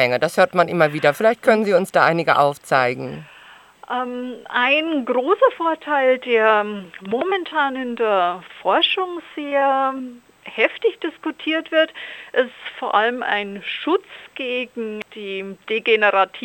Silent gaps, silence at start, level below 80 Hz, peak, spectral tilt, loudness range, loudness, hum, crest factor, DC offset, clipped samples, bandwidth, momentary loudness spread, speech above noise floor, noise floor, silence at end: none; 0 s; -70 dBFS; -2 dBFS; -5 dB/octave; 4 LU; -19 LUFS; none; 18 dB; under 0.1%; under 0.1%; 17 kHz; 13 LU; 26 dB; -46 dBFS; 0 s